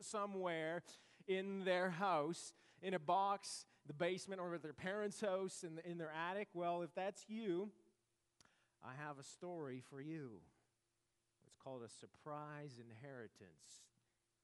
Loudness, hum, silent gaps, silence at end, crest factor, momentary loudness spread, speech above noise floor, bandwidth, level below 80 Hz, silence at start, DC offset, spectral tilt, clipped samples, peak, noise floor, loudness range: -45 LUFS; none; none; 0.6 s; 20 dB; 18 LU; 42 dB; 11.5 kHz; under -90 dBFS; 0 s; under 0.1%; -4.5 dB/octave; under 0.1%; -26 dBFS; -87 dBFS; 14 LU